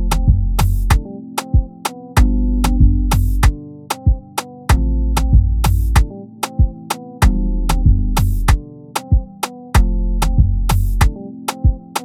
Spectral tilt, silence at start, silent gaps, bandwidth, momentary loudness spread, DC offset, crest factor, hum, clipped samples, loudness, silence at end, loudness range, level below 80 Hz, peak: -5.5 dB/octave; 0 s; none; 16 kHz; 11 LU; under 0.1%; 14 dB; none; under 0.1%; -18 LUFS; 0 s; 1 LU; -16 dBFS; 0 dBFS